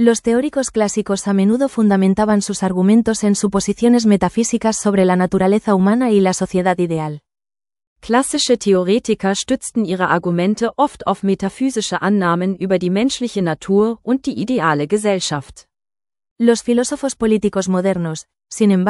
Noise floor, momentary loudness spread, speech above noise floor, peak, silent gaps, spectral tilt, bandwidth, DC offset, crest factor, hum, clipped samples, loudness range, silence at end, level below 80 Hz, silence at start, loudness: under -90 dBFS; 6 LU; over 74 dB; 0 dBFS; 7.87-7.96 s, 16.31-16.36 s; -5.5 dB/octave; 12 kHz; under 0.1%; 16 dB; none; under 0.1%; 4 LU; 0 s; -48 dBFS; 0 s; -17 LUFS